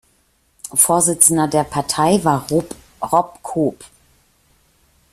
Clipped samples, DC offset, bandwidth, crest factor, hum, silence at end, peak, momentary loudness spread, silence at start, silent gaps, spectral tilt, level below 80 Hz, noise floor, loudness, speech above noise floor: under 0.1%; under 0.1%; 16 kHz; 20 dB; none; 1.3 s; 0 dBFS; 12 LU; 0.65 s; none; -4 dB/octave; -52 dBFS; -60 dBFS; -16 LUFS; 44 dB